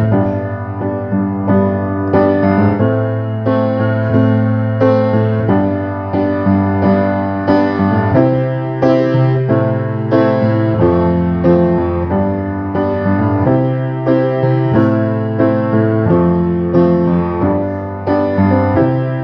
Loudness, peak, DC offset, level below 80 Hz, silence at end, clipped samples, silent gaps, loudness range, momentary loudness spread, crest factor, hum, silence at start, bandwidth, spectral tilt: -14 LUFS; 0 dBFS; under 0.1%; -40 dBFS; 0 s; under 0.1%; none; 1 LU; 5 LU; 12 dB; none; 0 s; 5.6 kHz; -11 dB/octave